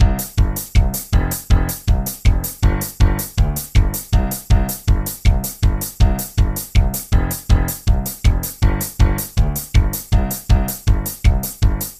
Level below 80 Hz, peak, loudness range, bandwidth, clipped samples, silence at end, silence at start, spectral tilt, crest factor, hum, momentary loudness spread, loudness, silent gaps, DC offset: -18 dBFS; -2 dBFS; 0 LU; 16 kHz; under 0.1%; 0.05 s; 0 s; -5 dB/octave; 14 dB; none; 2 LU; -19 LUFS; none; under 0.1%